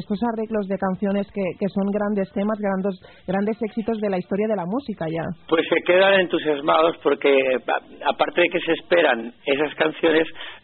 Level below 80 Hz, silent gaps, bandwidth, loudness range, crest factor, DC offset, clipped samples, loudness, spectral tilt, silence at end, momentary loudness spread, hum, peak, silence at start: -58 dBFS; none; 4.4 kHz; 5 LU; 18 dB; under 0.1%; under 0.1%; -22 LUFS; -3.5 dB/octave; 0.05 s; 9 LU; none; -4 dBFS; 0 s